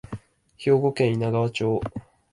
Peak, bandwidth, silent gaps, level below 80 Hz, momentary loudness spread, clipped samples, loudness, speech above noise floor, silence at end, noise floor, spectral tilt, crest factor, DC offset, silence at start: -8 dBFS; 11.5 kHz; none; -52 dBFS; 19 LU; under 0.1%; -24 LUFS; 20 dB; 0.3 s; -42 dBFS; -7.5 dB/octave; 16 dB; under 0.1%; 0.1 s